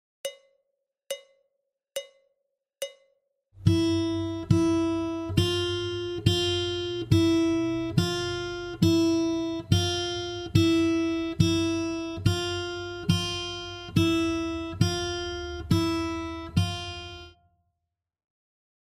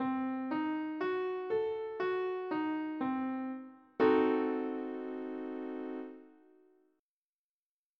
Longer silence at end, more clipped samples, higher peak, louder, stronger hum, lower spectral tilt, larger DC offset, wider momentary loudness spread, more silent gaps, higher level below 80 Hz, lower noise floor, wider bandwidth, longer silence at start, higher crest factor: about the same, 1.6 s vs 1.7 s; neither; first, -8 dBFS vs -16 dBFS; first, -27 LUFS vs -35 LUFS; neither; second, -6 dB/octave vs -7.5 dB/octave; neither; about the same, 15 LU vs 13 LU; neither; first, -48 dBFS vs -80 dBFS; second, -85 dBFS vs under -90 dBFS; first, 15.5 kHz vs 5.6 kHz; first, 0.25 s vs 0 s; about the same, 20 dB vs 20 dB